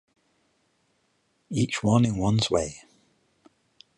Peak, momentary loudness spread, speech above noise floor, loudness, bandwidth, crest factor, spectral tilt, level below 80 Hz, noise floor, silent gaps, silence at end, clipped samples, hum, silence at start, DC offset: -8 dBFS; 12 LU; 47 dB; -25 LUFS; 11.5 kHz; 20 dB; -5.5 dB/octave; -52 dBFS; -71 dBFS; none; 1.2 s; under 0.1%; none; 1.5 s; under 0.1%